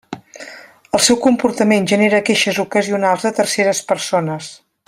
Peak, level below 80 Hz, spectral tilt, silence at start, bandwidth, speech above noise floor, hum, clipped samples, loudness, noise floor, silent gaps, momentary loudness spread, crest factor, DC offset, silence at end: 0 dBFS; -58 dBFS; -3.5 dB/octave; 0.1 s; 16 kHz; 23 dB; none; under 0.1%; -15 LUFS; -39 dBFS; none; 20 LU; 16 dB; under 0.1%; 0.35 s